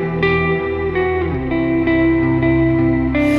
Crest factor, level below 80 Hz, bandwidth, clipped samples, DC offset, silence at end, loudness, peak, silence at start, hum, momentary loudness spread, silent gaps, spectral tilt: 12 dB; -30 dBFS; 5.4 kHz; under 0.1%; under 0.1%; 0 s; -16 LUFS; -4 dBFS; 0 s; none; 4 LU; none; -8.5 dB/octave